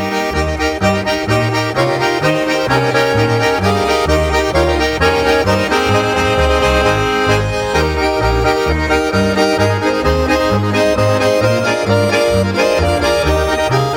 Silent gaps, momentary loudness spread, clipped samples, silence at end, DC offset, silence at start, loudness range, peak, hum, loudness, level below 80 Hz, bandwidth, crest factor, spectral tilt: none; 2 LU; under 0.1%; 0 s; under 0.1%; 0 s; 1 LU; 0 dBFS; none; -14 LUFS; -26 dBFS; 19 kHz; 12 dB; -5 dB/octave